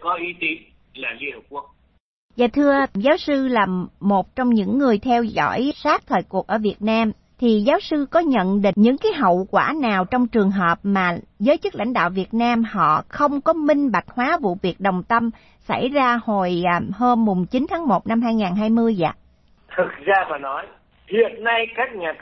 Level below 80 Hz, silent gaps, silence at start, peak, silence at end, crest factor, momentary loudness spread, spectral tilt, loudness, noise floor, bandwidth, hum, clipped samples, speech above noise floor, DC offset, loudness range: -52 dBFS; 2.00-2.29 s; 0 s; -4 dBFS; 0.05 s; 16 dB; 7 LU; -7.5 dB/octave; -20 LUFS; -54 dBFS; 6.2 kHz; none; under 0.1%; 35 dB; under 0.1%; 3 LU